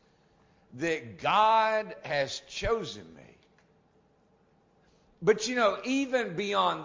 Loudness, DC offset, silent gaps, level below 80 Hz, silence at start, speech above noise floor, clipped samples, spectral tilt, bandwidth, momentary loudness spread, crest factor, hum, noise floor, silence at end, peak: -28 LUFS; under 0.1%; none; -56 dBFS; 0.75 s; 38 dB; under 0.1%; -4 dB/octave; 7.6 kHz; 10 LU; 20 dB; none; -66 dBFS; 0 s; -12 dBFS